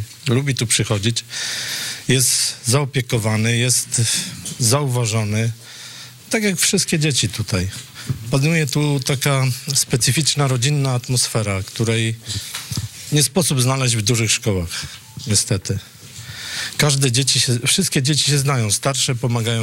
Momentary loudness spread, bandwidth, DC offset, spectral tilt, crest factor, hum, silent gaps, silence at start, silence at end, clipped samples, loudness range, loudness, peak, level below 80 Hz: 11 LU; 16.5 kHz; under 0.1%; -3.5 dB/octave; 12 dB; none; none; 0 s; 0 s; under 0.1%; 2 LU; -18 LUFS; -8 dBFS; -50 dBFS